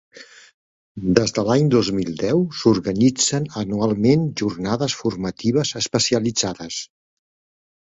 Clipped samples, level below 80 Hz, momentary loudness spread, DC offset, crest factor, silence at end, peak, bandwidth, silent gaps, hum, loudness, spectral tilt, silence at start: under 0.1%; -50 dBFS; 8 LU; under 0.1%; 20 dB; 1.1 s; 0 dBFS; 8.4 kHz; 0.54-0.95 s; none; -20 LUFS; -5 dB/octave; 0.15 s